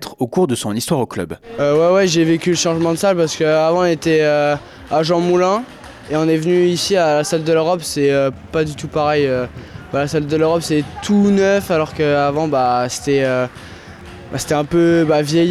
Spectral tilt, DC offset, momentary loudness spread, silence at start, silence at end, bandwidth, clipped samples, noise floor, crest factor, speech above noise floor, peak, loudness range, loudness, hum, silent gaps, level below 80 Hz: -5 dB/octave; under 0.1%; 10 LU; 0 s; 0 s; 14 kHz; under 0.1%; -35 dBFS; 10 dB; 20 dB; -6 dBFS; 3 LU; -16 LUFS; none; none; -48 dBFS